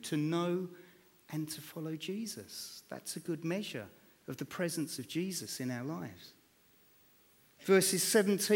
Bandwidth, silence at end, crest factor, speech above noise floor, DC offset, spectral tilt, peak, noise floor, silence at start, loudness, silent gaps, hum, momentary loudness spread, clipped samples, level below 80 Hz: 18.5 kHz; 0 s; 22 dB; 32 dB; under 0.1%; -4 dB/octave; -14 dBFS; -67 dBFS; 0 s; -35 LUFS; none; none; 18 LU; under 0.1%; -80 dBFS